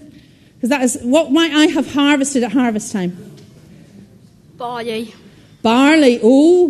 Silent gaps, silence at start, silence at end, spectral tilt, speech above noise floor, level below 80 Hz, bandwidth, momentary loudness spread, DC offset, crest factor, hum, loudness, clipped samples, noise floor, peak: none; 0.65 s; 0 s; -4 dB/octave; 32 dB; -54 dBFS; 13.5 kHz; 15 LU; under 0.1%; 16 dB; none; -14 LUFS; under 0.1%; -45 dBFS; 0 dBFS